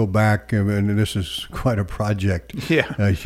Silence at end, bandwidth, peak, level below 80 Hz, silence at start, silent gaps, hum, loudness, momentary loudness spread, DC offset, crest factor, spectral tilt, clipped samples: 0 s; 15 kHz; -2 dBFS; -40 dBFS; 0 s; none; none; -21 LUFS; 6 LU; under 0.1%; 18 dB; -6.5 dB/octave; under 0.1%